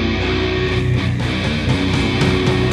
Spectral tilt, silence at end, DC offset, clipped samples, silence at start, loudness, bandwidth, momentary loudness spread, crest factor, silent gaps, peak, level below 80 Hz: -6 dB/octave; 0 s; under 0.1%; under 0.1%; 0 s; -17 LUFS; 12 kHz; 3 LU; 14 dB; none; -4 dBFS; -28 dBFS